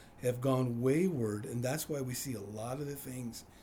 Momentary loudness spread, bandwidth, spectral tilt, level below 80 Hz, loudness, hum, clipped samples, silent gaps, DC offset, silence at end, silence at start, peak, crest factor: 10 LU; over 20 kHz; -6 dB/octave; -64 dBFS; -35 LUFS; none; under 0.1%; none; under 0.1%; 0 s; 0 s; -20 dBFS; 16 dB